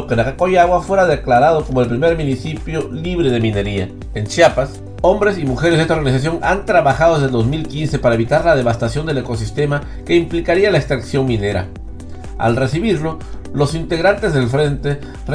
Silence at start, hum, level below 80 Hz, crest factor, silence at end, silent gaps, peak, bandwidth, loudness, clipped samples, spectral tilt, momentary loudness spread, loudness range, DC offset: 0 s; none; -32 dBFS; 16 dB; 0 s; none; 0 dBFS; 10.5 kHz; -16 LUFS; under 0.1%; -6.5 dB/octave; 10 LU; 3 LU; under 0.1%